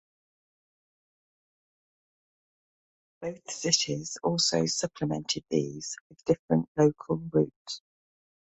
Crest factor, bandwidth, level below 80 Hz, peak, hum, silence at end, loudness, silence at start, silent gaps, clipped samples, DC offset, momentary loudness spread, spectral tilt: 22 dB; 8.4 kHz; -64 dBFS; -8 dBFS; none; 0.8 s; -28 LUFS; 3.2 s; 6.01-6.10 s, 6.39-6.49 s, 6.68-6.75 s, 7.56-7.65 s; under 0.1%; under 0.1%; 14 LU; -4 dB/octave